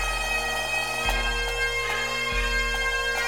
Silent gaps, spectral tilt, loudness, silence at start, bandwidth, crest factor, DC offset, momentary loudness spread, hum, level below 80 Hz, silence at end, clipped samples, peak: none; -1.5 dB/octave; -25 LUFS; 0 s; 19.5 kHz; 14 dB; 0.3%; 1 LU; none; -34 dBFS; 0 s; under 0.1%; -12 dBFS